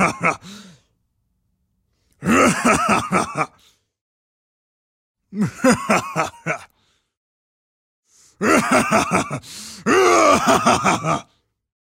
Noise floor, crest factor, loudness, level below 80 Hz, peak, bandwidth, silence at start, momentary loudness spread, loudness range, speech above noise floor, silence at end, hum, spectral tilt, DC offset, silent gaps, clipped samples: -69 dBFS; 18 dB; -18 LUFS; -52 dBFS; -2 dBFS; 16 kHz; 0 s; 13 LU; 7 LU; 51 dB; 0.6 s; none; -4 dB/octave; under 0.1%; 4.01-5.15 s, 7.17-8.03 s; under 0.1%